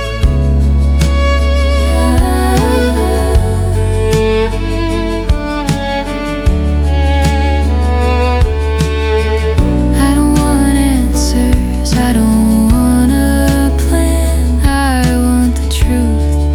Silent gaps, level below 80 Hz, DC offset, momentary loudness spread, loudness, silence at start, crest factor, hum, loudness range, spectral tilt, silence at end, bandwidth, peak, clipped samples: none; -14 dBFS; under 0.1%; 5 LU; -12 LUFS; 0 s; 10 dB; none; 3 LU; -6 dB/octave; 0 s; 16 kHz; 0 dBFS; under 0.1%